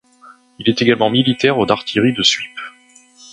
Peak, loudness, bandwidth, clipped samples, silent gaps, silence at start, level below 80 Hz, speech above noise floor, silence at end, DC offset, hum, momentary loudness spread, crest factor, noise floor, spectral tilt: 0 dBFS; -15 LUFS; 10.5 kHz; under 0.1%; none; 0.25 s; -54 dBFS; 33 dB; 0.65 s; under 0.1%; none; 13 LU; 18 dB; -48 dBFS; -4.5 dB/octave